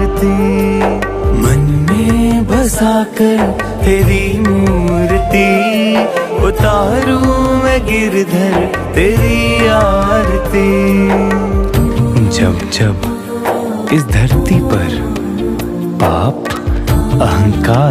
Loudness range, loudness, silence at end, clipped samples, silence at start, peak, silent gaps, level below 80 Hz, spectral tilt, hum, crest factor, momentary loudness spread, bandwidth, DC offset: 3 LU; -12 LUFS; 0 s; under 0.1%; 0 s; 0 dBFS; none; -20 dBFS; -6.5 dB/octave; none; 12 dB; 5 LU; 15.5 kHz; under 0.1%